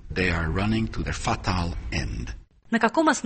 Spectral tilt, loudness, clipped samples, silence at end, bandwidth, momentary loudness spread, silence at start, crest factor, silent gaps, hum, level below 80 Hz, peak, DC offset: -5 dB/octave; -26 LUFS; under 0.1%; 0 s; 8.8 kHz; 12 LU; 0 s; 18 dB; none; none; -34 dBFS; -6 dBFS; under 0.1%